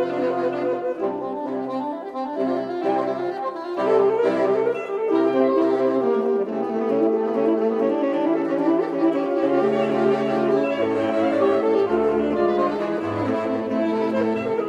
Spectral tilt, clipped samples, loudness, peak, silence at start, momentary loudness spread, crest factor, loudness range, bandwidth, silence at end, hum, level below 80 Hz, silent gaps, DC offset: -7.5 dB/octave; under 0.1%; -22 LUFS; -8 dBFS; 0 s; 7 LU; 14 dB; 4 LU; 8.4 kHz; 0 s; none; -60 dBFS; none; under 0.1%